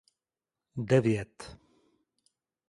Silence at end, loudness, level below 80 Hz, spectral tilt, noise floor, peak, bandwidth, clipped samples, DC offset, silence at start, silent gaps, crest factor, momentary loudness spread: 1.15 s; -28 LUFS; -62 dBFS; -7.5 dB/octave; under -90 dBFS; -12 dBFS; 11.5 kHz; under 0.1%; under 0.1%; 0.75 s; none; 22 dB; 22 LU